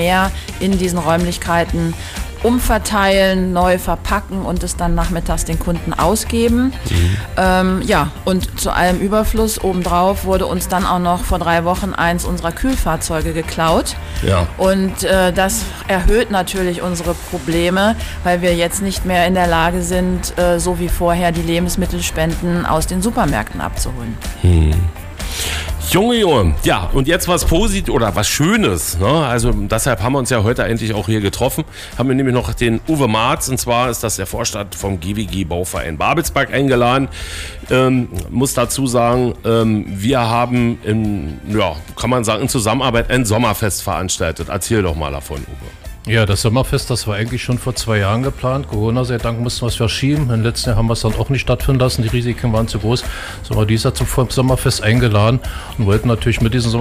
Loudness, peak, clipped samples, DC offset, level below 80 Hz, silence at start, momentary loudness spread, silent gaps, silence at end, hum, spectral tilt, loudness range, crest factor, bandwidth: -16 LUFS; -4 dBFS; under 0.1%; under 0.1%; -26 dBFS; 0 s; 7 LU; none; 0 s; none; -5 dB/octave; 2 LU; 12 dB; 16 kHz